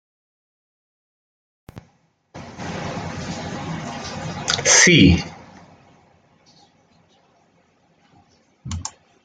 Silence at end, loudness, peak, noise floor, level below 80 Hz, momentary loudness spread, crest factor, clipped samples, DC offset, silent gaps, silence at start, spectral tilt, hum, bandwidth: 0.35 s; -18 LUFS; 0 dBFS; -61 dBFS; -46 dBFS; 24 LU; 24 dB; under 0.1%; under 0.1%; none; 1.75 s; -3 dB/octave; none; 10 kHz